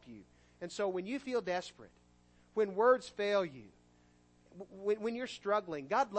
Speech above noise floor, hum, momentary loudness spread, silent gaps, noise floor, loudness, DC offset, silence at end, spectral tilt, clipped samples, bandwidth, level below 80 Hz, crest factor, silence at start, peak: 32 dB; 60 Hz at -70 dBFS; 22 LU; none; -67 dBFS; -35 LUFS; under 0.1%; 0 s; -4.5 dB/octave; under 0.1%; 8.4 kHz; -72 dBFS; 22 dB; 0.05 s; -16 dBFS